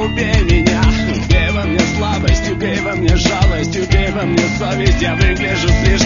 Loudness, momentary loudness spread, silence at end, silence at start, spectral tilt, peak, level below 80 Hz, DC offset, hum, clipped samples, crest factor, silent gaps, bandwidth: -14 LUFS; 3 LU; 0 s; 0 s; -5.5 dB/octave; 0 dBFS; -18 dBFS; 0.4%; none; under 0.1%; 14 dB; none; 7.4 kHz